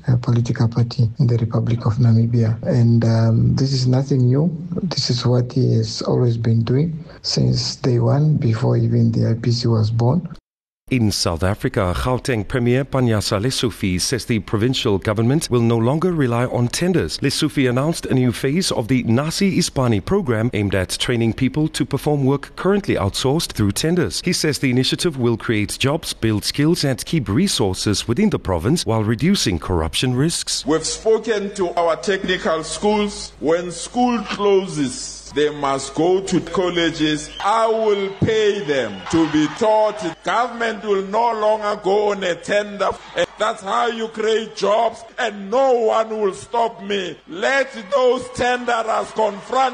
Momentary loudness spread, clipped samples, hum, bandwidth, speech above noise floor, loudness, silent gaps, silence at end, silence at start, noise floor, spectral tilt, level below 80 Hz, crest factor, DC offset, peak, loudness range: 5 LU; under 0.1%; none; 13 kHz; 31 dB; -19 LUFS; 10.40-10.44 s, 10.50-10.57 s, 10.68-10.87 s; 0 s; 0.05 s; -49 dBFS; -5.5 dB/octave; -42 dBFS; 12 dB; under 0.1%; -6 dBFS; 3 LU